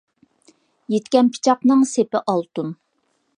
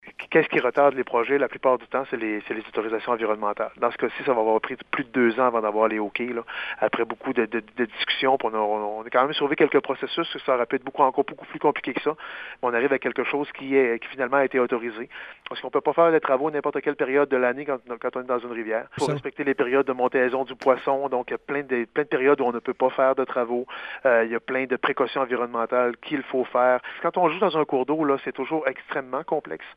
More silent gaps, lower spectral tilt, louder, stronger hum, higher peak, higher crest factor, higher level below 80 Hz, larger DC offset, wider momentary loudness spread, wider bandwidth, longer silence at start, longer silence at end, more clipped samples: neither; about the same, -5 dB/octave vs -6 dB/octave; first, -19 LUFS vs -24 LUFS; neither; about the same, -2 dBFS vs -4 dBFS; about the same, 18 dB vs 20 dB; second, -74 dBFS vs -68 dBFS; neither; first, 12 LU vs 8 LU; about the same, 10.5 kHz vs 9.8 kHz; first, 0.9 s vs 0.05 s; first, 0.65 s vs 0.05 s; neither